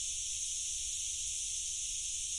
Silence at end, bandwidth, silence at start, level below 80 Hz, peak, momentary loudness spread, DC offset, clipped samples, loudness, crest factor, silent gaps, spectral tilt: 0 s; 11.5 kHz; 0 s; -58 dBFS; -24 dBFS; 0 LU; under 0.1%; under 0.1%; -35 LUFS; 14 dB; none; 3 dB/octave